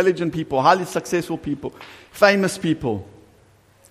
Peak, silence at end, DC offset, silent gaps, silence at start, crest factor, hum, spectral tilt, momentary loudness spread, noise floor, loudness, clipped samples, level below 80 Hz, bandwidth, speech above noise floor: -2 dBFS; 0.85 s; under 0.1%; none; 0 s; 20 dB; none; -5 dB/octave; 15 LU; -54 dBFS; -21 LUFS; under 0.1%; -52 dBFS; 15.5 kHz; 34 dB